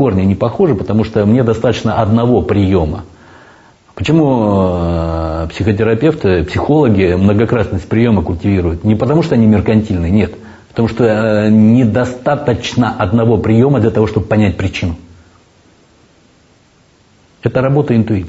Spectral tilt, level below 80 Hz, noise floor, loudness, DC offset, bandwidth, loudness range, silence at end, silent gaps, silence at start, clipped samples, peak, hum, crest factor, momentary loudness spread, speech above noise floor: -8 dB/octave; -32 dBFS; -49 dBFS; -13 LUFS; under 0.1%; 8 kHz; 5 LU; 0 s; none; 0 s; under 0.1%; 0 dBFS; none; 12 dB; 7 LU; 38 dB